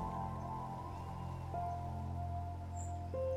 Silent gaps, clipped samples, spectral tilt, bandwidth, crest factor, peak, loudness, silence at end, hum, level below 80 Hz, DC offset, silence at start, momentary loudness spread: none; under 0.1%; -7.5 dB/octave; 12.5 kHz; 14 dB; -28 dBFS; -43 LUFS; 0 s; none; -56 dBFS; under 0.1%; 0 s; 4 LU